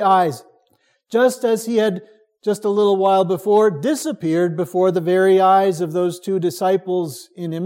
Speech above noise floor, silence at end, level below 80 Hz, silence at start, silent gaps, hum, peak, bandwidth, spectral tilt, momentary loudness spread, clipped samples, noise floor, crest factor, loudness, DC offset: 45 dB; 0 s; -74 dBFS; 0 s; none; none; -4 dBFS; 16.5 kHz; -6 dB/octave; 9 LU; under 0.1%; -63 dBFS; 14 dB; -18 LUFS; under 0.1%